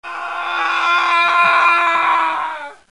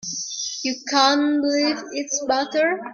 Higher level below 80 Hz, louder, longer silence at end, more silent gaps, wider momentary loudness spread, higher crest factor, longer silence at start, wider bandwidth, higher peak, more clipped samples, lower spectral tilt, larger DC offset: about the same, -68 dBFS vs -68 dBFS; first, -14 LUFS vs -21 LUFS; first, 0.2 s vs 0 s; neither; first, 13 LU vs 9 LU; about the same, 16 dB vs 18 dB; about the same, 0.05 s vs 0 s; first, 11 kHz vs 7.4 kHz; about the same, 0 dBFS vs -2 dBFS; neither; about the same, -1 dB/octave vs -1 dB/octave; first, 0.3% vs under 0.1%